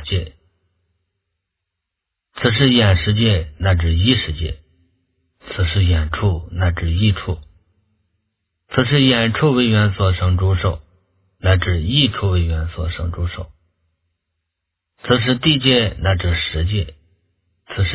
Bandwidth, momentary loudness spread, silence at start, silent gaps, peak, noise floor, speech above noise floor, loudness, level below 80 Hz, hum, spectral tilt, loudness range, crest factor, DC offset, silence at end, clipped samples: 4 kHz; 13 LU; 0 s; none; 0 dBFS; -81 dBFS; 64 dB; -17 LUFS; -28 dBFS; none; -10.5 dB/octave; 4 LU; 18 dB; under 0.1%; 0 s; under 0.1%